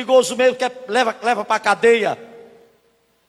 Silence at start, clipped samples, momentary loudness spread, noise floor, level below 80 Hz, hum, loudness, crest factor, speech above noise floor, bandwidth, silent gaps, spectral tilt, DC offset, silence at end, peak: 0 s; under 0.1%; 9 LU; -61 dBFS; -68 dBFS; none; -18 LUFS; 16 dB; 44 dB; 13 kHz; none; -2.5 dB/octave; under 0.1%; 0.9 s; -2 dBFS